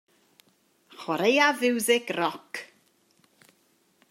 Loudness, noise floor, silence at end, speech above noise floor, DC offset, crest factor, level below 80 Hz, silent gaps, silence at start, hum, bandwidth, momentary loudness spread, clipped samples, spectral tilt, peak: -24 LUFS; -67 dBFS; 1.45 s; 42 dB; under 0.1%; 22 dB; -84 dBFS; none; 1 s; none; 16 kHz; 18 LU; under 0.1%; -3 dB/octave; -8 dBFS